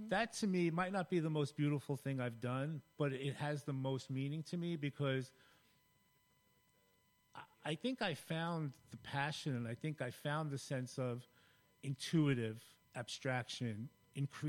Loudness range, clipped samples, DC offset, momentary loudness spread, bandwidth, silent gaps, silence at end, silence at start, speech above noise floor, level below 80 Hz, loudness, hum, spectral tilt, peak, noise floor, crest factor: 6 LU; under 0.1%; under 0.1%; 12 LU; 16.5 kHz; none; 0 s; 0 s; 35 dB; -78 dBFS; -41 LUFS; none; -6 dB/octave; -24 dBFS; -76 dBFS; 18 dB